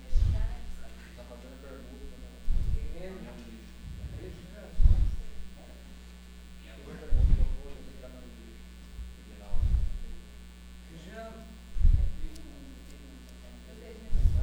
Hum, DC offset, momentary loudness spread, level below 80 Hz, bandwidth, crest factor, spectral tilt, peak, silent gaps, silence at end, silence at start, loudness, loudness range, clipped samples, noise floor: none; under 0.1%; 21 LU; -30 dBFS; 9.4 kHz; 20 dB; -7 dB/octave; -10 dBFS; none; 0 s; 0 s; -34 LUFS; 6 LU; under 0.1%; -48 dBFS